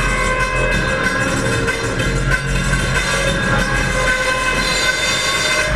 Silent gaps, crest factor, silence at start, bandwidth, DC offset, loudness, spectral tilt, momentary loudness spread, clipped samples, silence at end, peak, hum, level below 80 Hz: none; 14 dB; 0 s; 15.5 kHz; 0.7%; -16 LUFS; -3.5 dB/octave; 3 LU; under 0.1%; 0 s; -4 dBFS; none; -26 dBFS